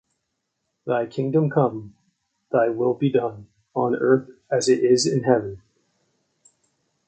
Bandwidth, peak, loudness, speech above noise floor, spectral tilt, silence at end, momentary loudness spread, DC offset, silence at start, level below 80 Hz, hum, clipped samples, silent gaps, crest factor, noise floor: 9.2 kHz; -2 dBFS; -22 LUFS; 56 dB; -5.5 dB/octave; 1.5 s; 11 LU; under 0.1%; 0.85 s; -64 dBFS; none; under 0.1%; none; 20 dB; -77 dBFS